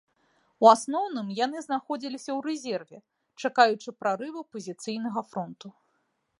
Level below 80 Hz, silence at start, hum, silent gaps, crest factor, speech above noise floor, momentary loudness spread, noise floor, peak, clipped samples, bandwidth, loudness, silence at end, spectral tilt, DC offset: -84 dBFS; 0.6 s; none; none; 24 dB; 47 dB; 17 LU; -74 dBFS; -4 dBFS; under 0.1%; 11.5 kHz; -27 LUFS; 0.7 s; -4 dB/octave; under 0.1%